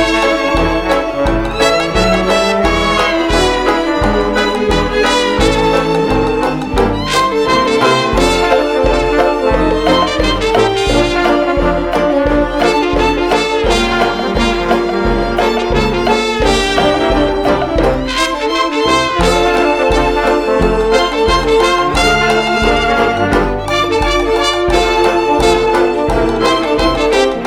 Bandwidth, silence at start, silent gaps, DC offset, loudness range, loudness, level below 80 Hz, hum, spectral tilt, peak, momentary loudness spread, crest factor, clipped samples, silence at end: 16 kHz; 0 s; none; under 0.1%; 1 LU; -12 LUFS; -24 dBFS; none; -4.5 dB/octave; 0 dBFS; 3 LU; 12 dB; under 0.1%; 0 s